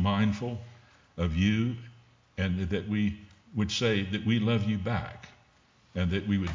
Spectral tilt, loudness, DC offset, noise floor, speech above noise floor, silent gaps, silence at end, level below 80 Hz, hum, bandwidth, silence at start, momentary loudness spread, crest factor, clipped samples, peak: -6.5 dB/octave; -30 LUFS; under 0.1%; -63 dBFS; 34 dB; none; 0 s; -44 dBFS; none; 7.6 kHz; 0 s; 16 LU; 16 dB; under 0.1%; -14 dBFS